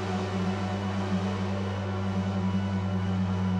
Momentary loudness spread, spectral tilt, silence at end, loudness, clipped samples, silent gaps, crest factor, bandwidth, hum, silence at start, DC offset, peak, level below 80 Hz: 2 LU; -7.5 dB/octave; 0 s; -30 LUFS; under 0.1%; none; 10 dB; 9 kHz; none; 0 s; under 0.1%; -18 dBFS; -58 dBFS